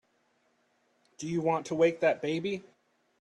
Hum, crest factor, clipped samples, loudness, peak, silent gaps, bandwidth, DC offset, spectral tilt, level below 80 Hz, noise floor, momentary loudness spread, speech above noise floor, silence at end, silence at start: none; 18 dB; under 0.1%; -30 LUFS; -14 dBFS; none; 10.5 kHz; under 0.1%; -5.5 dB/octave; -74 dBFS; -72 dBFS; 12 LU; 43 dB; 0.6 s; 1.2 s